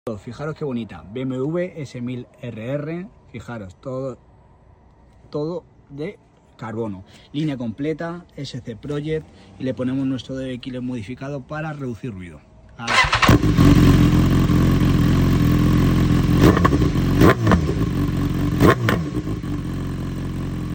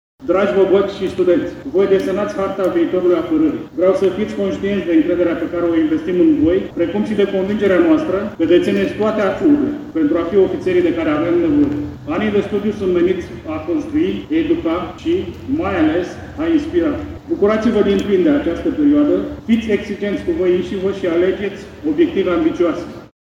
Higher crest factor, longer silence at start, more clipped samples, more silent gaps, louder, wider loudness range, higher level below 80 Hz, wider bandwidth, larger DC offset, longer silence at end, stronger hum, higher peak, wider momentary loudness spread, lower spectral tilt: about the same, 20 dB vs 16 dB; second, 0.05 s vs 0.2 s; neither; neither; second, -20 LUFS vs -17 LUFS; first, 16 LU vs 3 LU; first, -30 dBFS vs -42 dBFS; first, 17 kHz vs 7.8 kHz; neither; second, 0 s vs 0.25 s; neither; about the same, 0 dBFS vs 0 dBFS; first, 18 LU vs 7 LU; about the same, -6.5 dB/octave vs -7.5 dB/octave